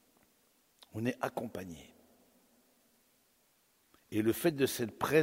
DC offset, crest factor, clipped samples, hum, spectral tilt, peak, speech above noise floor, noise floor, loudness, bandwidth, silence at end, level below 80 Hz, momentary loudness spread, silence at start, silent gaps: under 0.1%; 24 dB; under 0.1%; none; -5 dB/octave; -14 dBFS; 39 dB; -72 dBFS; -35 LUFS; 16 kHz; 0 s; -70 dBFS; 17 LU; 0.95 s; none